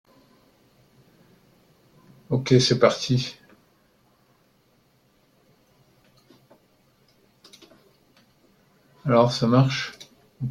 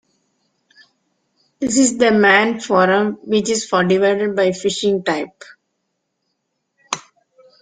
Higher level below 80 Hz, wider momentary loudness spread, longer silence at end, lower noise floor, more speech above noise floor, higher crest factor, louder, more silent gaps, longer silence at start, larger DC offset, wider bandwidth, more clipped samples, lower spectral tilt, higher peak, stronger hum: about the same, -62 dBFS vs -60 dBFS; about the same, 15 LU vs 14 LU; second, 0 s vs 0.6 s; second, -63 dBFS vs -73 dBFS; second, 43 dB vs 57 dB; first, 24 dB vs 18 dB; second, -22 LUFS vs -16 LUFS; neither; first, 2.3 s vs 1.6 s; neither; first, 11.5 kHz vs 9.6 kHz; neither; first, -6 dB/octave vs -4 dB/octave; about the same, -2 dBFS vs 0 dBFS; neither